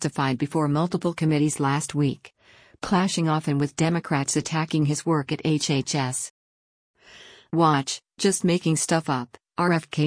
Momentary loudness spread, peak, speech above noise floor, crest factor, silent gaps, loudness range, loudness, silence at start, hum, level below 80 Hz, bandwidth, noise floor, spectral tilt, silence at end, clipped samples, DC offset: 6 LU; -8 dBFS; 26 dB; 16 dB; 6.30-6.94 s; 2 LU; -24 LUFS; 0 s; none; -60 dBFS; 10.5 kHz; -49 dBFS; -5 dB/octave; 0 s; under 0.1%; under 0.1%